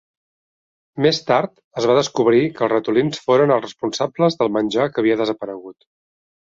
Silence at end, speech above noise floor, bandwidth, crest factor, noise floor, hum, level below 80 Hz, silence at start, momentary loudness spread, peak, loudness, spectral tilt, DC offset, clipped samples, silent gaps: 0.8 s; over 72 dB; 7.8 kHz; 16 dB; under -90 dBFS; none; -60 dBFS; 0.95 s; 10 LU; -2 dBFS; -18 LUFS; -5.5 dB/octave; under 0.1%; under 0.1%; 1.64-1.71 s